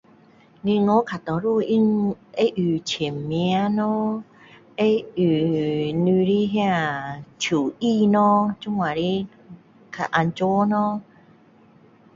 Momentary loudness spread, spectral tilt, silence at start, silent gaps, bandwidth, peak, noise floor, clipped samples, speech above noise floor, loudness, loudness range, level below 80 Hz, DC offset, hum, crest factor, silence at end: 9 LU; -6.5 dB/octave; 0.65 s; none; 7.6 kHz; -4 dBFS; -53 dBFS; under 0.1%; 32 dB; -22 LUFS; 3 LU; -60 dBFS; under 0.1%; none; 18 dB; 1.15 s